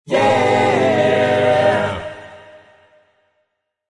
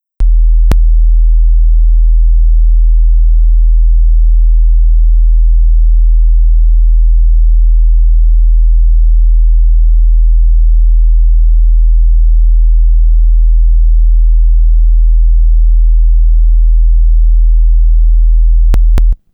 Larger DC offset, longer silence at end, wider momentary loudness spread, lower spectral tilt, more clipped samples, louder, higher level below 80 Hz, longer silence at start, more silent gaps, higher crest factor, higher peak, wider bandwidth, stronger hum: neither; first, 1.5 s vs 0.2 s; first, 13 LU vs 0 LU; second, -5.5 dB/octave vs -8.5 dB/octave; neither; second, -15 LUFS vs -11 LUFS; second, -56 dBFS vs -6 dBFS; second, 0.05 s vs 0.2 s; neither; first, 14 dB vs 4 dB; about the same, -2 dBFS vs -2 dBFS; first, 11 kHz vs 0.7 kHz; neither